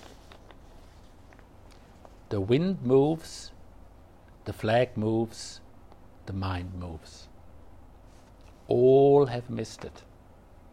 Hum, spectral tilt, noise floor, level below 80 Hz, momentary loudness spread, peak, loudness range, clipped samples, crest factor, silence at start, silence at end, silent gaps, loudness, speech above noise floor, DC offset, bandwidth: none; -7 dB/octave; -53 dBFS; -54 dBFS; 23 LU; -10 dBFS; 9 LU; under 0.1%; 20 dB; 0.75 s; 0.75 s; none; -26 LUFS; 27 dB; under 0.1%; 12 kHz